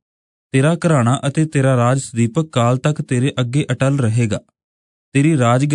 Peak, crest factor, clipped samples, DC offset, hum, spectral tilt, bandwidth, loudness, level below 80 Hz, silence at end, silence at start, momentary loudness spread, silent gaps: -2 dBFS; 14 dB; under 0.1%; under 0.1%; none; -6.5 dB/octave; 10.5 kHz; -17 LUFS; -58 dBFS; 0 s; 0.55 s; 5 LU; 4.64-5.12 s